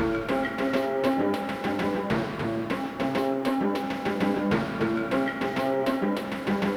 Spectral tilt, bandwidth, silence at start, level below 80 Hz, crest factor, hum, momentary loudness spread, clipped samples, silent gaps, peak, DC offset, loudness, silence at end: -6.5 dB/octave; 18.5 kHz; 0 s; -52 dBFS; 14 dB; none; 4 LU; under 0.1%; none; -12 dBFS; under 0.1%; -27 LUFS; 0 s